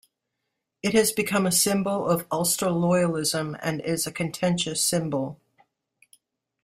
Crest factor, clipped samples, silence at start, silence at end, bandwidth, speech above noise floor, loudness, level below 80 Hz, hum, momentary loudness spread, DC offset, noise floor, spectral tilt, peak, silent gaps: 20 dB; under 0.1%; 0.85 s; 1.3 s; 16 kHz; 57 dB; -24 LUFS; -62 dBFS; none; 8 LU; under 0.1%; -81 dBFS; -4 dB/octave; -6 dBFS; none